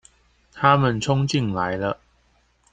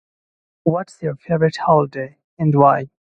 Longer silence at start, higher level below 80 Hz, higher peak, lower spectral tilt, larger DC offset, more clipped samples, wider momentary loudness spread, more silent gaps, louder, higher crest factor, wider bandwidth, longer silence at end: about the same, 0.55 s vs 0.65 s; about the same, -52 dBFS vs -56 dBFS; about the same, -2 dBFS vs 0 dBFS; second, -6 dB/octave vs -8.5 dB/octave; neither; neither; second, 10 LU vs 13 LU; second, none vs 2.24-2.37 s; second, -21 LUFS vs -18 LUFS; about the same, 22 dB vs 18 dB; about the same, 9.2 kHz vs 8.8 kHz; first, 0.8 s vs 0.3 s